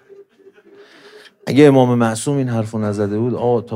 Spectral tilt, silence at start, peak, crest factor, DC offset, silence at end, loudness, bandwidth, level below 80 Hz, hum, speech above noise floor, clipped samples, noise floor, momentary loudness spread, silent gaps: -7 dB/octave; 0.2 s; 0 dBFS; 18 dB; under 0.1%; 0 s; -16 LUFS; 15.5 kHz; -66 dBFS; none; 33 dB; under 0.1%; -48 dBFS; 10 LU; none